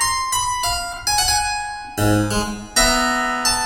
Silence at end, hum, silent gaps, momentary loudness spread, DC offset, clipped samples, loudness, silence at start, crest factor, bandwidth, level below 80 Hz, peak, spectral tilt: 0 s; none; none; 7 LU; under 0.1%; under 0.1%; -18 LUFS; 0 s; 18 dB; 17 kHz; -34 dBFS; -2 dBFS; -2.5 dB/octave